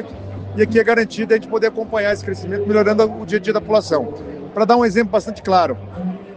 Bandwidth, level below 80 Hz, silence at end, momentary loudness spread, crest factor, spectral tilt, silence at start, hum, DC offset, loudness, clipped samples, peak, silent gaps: 9 kHz; -48 dBFS; 0 s; 13 LU; 16 dB; -6 dB/octave; 0 s; none; under 0.1%; -17 LUFS; under 0.1%; 0 dBFS; none